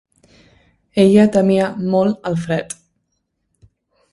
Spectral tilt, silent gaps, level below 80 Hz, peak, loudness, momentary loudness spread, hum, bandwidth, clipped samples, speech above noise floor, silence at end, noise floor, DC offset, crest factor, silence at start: -7 dB/octave; none; -54 dBFS; 0 dBFS; -16 LUFS; 13 LU; none; 11.5 kHz; under 0.1%; 56 dB; 1.4 s; -71 dBFS; under 0.1%; 18 dB; 0.95 s